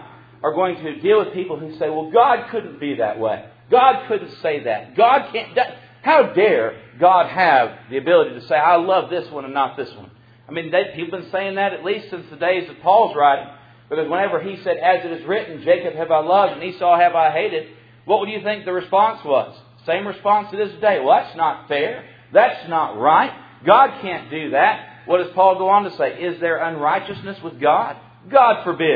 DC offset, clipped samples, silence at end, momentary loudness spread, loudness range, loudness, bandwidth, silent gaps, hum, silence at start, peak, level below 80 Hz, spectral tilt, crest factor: under 0.1%; under 0.1%; 0 s; 12 LU; 4 LU; -18 LUFS; 5 kHz; none; none; 0 s; 0 dBFS; -66 dBFS; -8 dB/octave; 18 dB